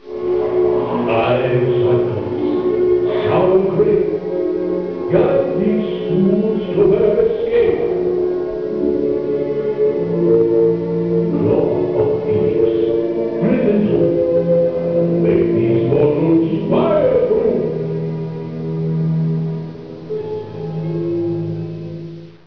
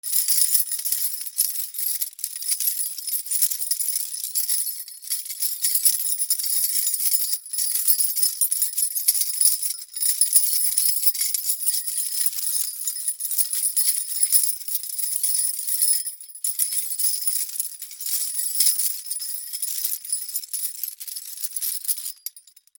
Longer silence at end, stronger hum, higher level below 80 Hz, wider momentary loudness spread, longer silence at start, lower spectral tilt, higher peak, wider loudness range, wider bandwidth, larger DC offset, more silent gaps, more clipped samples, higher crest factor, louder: second, 0.15 s vs 0.4 s; neither; first, -46 dBFS vs under -90 dBFS; about the same, 10 LU vs 10 LU; about the same, 0.05 s vs 0.05 s; first, -10.5 dB/octave vs 10 dB/octave; about the same, -2 dBFS vs 0 dBFS; about the same, 6 LU vs 4 LU; second, 5.4 kHz vs over 20 kHz; first, 0.3% vs under 0.1%; neither; neither; second, 14 dB vs 24 dB; first, -17 LUFS vs -21 LUFS